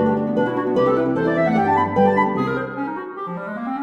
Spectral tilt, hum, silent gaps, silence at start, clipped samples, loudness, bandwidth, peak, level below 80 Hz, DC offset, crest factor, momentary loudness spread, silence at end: -8.5 dB/octave; none; none; 0 s; under 0.1%; -20 LUFS; 7.6 kHz; -6 dBFS; -54 dBFS; under 0.1%; 14 dB; 11 LU; 0 s